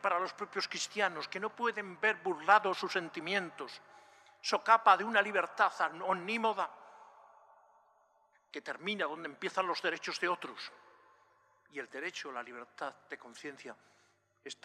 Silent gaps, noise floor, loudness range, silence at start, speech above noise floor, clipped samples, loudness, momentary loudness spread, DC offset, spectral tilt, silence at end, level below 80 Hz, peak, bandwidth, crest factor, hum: none; -71 dBFS; 14 LU; 0.05 s; 37 dB; under 0.1%; -33 LUFS; 20 LU; under 0.1%; -2.5 dB/octave; 0.1 s; under -90 dBFS; -10 dBFS; 13.5 kHz; 24 dB; none